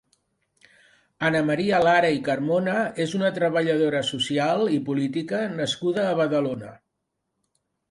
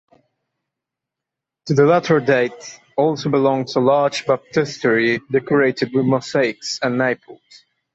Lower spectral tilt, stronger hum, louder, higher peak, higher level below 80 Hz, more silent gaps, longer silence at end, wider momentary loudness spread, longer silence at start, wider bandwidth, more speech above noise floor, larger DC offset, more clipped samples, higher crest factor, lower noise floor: about the same, -5.5 dB/octave vs -5.5 dB/octave; neither; second, -23 LUFS vs -18 LUFS; second, -6 dBFS vs -2 dBFS; about the same, -64 dBFS vs -62 dBFS; neither; first, 1.15 s vs 0.6 s; about the same, 6 LU vs 6 LU; second, 1.2 s vs 1.65 s; first, 11.5 kHz vs 8.2 kHz; second, 56 dB vs 67 dB; neither; neither; about the same, 18 dB vs 16 dB; second, -79 dBFS vs -85 dBFS